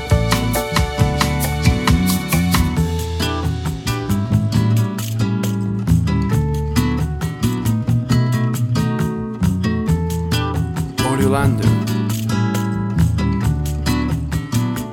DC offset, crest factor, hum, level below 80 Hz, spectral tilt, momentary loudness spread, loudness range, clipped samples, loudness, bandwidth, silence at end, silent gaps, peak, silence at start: under 0.1%; 16 dB; none; -28 dBFS; -6 dB/octave; 5 LU; 1 LU; under 0.1%; -18 LUFS; 17.5 kHz; 0 s; none; 0 dBFS; 0 s